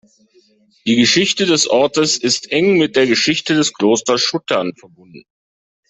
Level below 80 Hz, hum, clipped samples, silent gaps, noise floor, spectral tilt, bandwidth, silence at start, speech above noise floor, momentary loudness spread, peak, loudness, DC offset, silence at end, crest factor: -58 dBFS; none; under 0.1%; none; under -90 dBFS; -3 dB/octave; 8.4 kHz; 0.85 s; over 74 dB; 6 LU; -2 dBFS; -14 LUFS; under 0.1%; 0.7 s; 14 dB